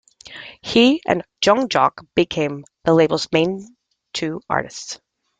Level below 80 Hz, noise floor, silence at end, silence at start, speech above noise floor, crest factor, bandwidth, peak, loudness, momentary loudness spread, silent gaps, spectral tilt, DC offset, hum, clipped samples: -56 dBFS; -39 dBFS; 0.45 s; 0.25 s; 21 dB; 18 dB; 9.4 kHz; -2 dBFS; -19 LUFS; 17 LU; none; -4.5 dB/octave; under 0.1%; none; under 0.1%